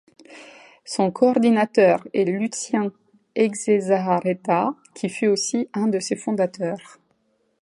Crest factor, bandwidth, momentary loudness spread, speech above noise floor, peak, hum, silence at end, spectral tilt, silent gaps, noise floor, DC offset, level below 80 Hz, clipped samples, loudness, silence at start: 18 dB; 11.5 kHz; 11 LU; 46 dB; -4 dBFS; none; 0.8 s; -5 dB/octave; none; -67 dBFS; under 0.1%; -72 dBFS; under 0.1%; -22 LUFS; 0.3 s